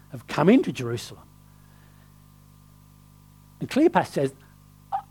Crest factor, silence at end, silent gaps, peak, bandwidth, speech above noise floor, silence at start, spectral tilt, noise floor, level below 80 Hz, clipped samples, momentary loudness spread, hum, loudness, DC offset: 24 dB; 0.1 s; none; -4 dBFS; 19 kHz; 29 dB; 0.15 s; -6.5 dB/octave; -52 dBFS; -58 dBFS; under 0.1%; 15 LU; 50 Hz at -55 dBFS; -24 LUFS; under 0.1%